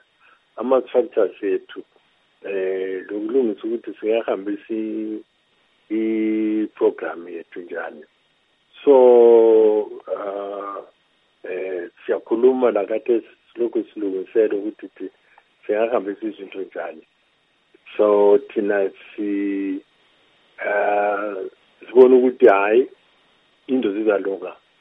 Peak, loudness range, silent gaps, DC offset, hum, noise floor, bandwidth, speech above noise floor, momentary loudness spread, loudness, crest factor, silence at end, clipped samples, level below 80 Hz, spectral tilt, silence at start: 0 dBFS; 8 LU; none; under 0.1%; none; -63 dBFS; 3.9 kHz; 44 dB; 19 LU; -20 LUFS; 20 dB; 0.3 s; under 0.1%; -78 dBFS; -8.5 dB/octave; 0.55 s